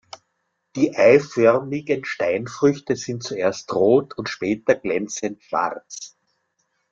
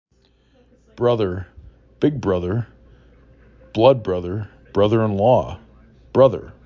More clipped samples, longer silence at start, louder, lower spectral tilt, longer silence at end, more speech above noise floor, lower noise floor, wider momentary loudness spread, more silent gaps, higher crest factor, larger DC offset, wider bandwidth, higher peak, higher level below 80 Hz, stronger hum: neither; second, 0.75 s vs 0.95 s; about the same, -21 LUFS vs -19 LUFS; second, -5 dB/octave vs -8.5 dB/octave; first, 0.85 s vs 0.15 s; first, 53 dB vs 40 dB; first, -74 dBFS vs -58 dBFS; second, 13 LU vs 16 LU; neither; about the same, 20 dB vs 20 dB; neither; first, 7.6 kHz vs 6.8 kHz; about the same, -2 dBFS vs -2 dBFS; second, -64 dBFS vs -44 dBFS; neither